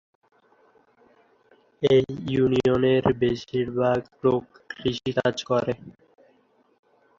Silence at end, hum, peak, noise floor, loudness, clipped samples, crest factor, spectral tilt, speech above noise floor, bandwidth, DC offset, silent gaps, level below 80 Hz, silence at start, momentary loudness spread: 1.3 s; none; -6 dBFS; -63 dBFS; -24 LUFS; under 0.1%; 18 dB; -7 dB/octave; 40 dB; 7.4 kHz; under 0.1%; none; -54 dBFS; 1.8 s; 8 LU